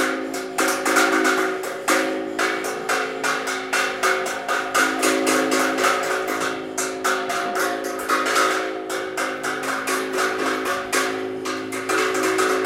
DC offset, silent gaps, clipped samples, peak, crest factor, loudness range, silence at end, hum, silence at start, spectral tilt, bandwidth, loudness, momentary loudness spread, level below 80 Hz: under 0.1%; none; under 0.1%; -4 dBFS; 18 dB; 2 LU; 0 s; none; 0 s; -1.5 dB/octave; 17 kHz; -21 LUFS; 7 LU; -64 dBFS